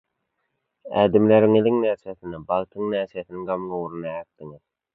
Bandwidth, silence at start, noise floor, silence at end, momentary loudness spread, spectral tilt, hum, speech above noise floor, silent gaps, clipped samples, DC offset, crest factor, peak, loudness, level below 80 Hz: 4.1 kHz; 0.85 s; -76 dBFS; 0.4 s; 18 LU; -10 dB/octave; none; 54 dB; none; under 0.1%; under 0.1%; 20 dB; -4 dBFS; -22 LUFS; -58 dBFS